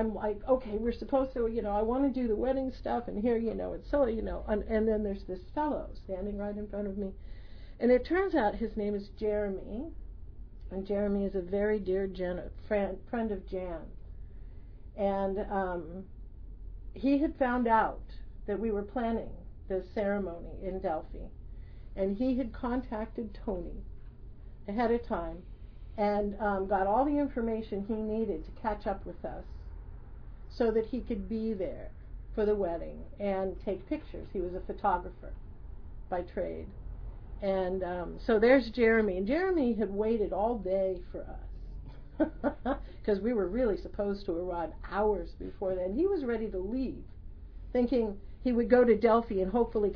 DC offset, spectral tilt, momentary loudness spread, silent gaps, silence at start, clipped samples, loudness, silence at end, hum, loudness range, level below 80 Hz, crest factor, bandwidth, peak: under 0.1%; -6 dB/octave; 21 LU; none; 0 s; under 0.1%; -32 LUFS; 0 s; none; 7 LU; -44 dBFS; 22 dB; 5.4 kHz; -10 dBFS